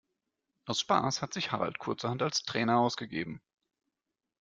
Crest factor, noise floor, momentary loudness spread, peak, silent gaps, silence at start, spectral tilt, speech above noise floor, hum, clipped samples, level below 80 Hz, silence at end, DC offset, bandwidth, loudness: 22 dB; -88 dBFS; 10 LU; -12 dBFS; none; 0.65 s; -4 dB/octave; 57 dB; none; under 0.1%; -70 dBFS; 1.05 s; under 0.1%; 9.4 kHz; -31 LUFS